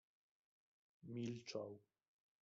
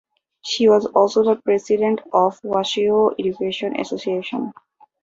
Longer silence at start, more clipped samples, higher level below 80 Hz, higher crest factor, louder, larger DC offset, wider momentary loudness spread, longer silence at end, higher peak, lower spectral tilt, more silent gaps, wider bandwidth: first, 1.05 s vs 0.45 s; neither; second, -88 dBFS vs -64 dBFS; about the same, 20 dB vs 18 dB; second, -50 LUFS vs -19 LUFS; neither; first, 15 LU vs 10 LU; about the same, 0.6 s vs 0.5 s; second, -32 dBFS vs -2 dBFS; about the same, -6 dB/octave vs -5 dB/octave; neither; about the same, 7.6 kHz vs 7.8 kHz